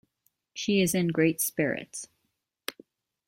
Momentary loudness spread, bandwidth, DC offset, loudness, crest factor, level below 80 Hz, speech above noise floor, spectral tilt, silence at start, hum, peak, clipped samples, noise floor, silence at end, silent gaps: 16 LU; 16.5 kHz; under 0.1%; -27 LUFS; 20 dB; -66 dBFS; 53 dB; -4.5 dB/octave; 0.55 s; none; -10 dBFS; under 0.1%; -79 dBFS; 0.55 s; none